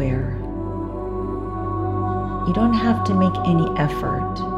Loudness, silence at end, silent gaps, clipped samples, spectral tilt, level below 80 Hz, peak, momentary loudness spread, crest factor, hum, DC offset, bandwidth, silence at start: -22 LUFS; 0 s; none; under 0.1%; -8.5 dB/octave; -34 dBFS; -6 dBFS; 9 LU; 16 dB; 50 Hz at -40 dBFS; 0.1%; 12 kHz; 0 s